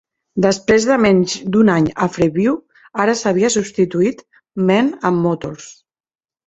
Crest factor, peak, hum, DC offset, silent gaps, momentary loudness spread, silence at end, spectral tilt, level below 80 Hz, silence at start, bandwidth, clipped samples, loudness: 16 dB; 0 dBFS; none; under 0.1%; none; 12 LU; 0.75 s; -5.5 dB/octave; -50 dBFS; 0.35 s; 8.2 kHz; under 0.1%; -16 LUFS